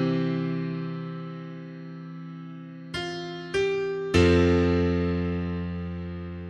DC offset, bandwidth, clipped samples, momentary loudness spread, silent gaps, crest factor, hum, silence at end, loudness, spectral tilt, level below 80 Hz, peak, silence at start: under 0.1%; 10.5 kHz; under 0.1%; 19 LU; none; 20 dB; none; 0 s; -26 LUFS; -7 dB/octave; -44 dBFS; -6 dBFS; 0 s